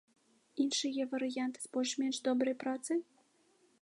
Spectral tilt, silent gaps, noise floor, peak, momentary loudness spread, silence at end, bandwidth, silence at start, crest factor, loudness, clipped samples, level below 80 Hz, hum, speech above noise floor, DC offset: -2 dB/octave; none; -71 dBFS; -20 dBFS; 5 LU; 0.8 s; 11.5 kHz; 0.55 s; 16 dB; -35 LUFS; under 0.1%; -90 dBFS; none; 36 dB; under 0.1%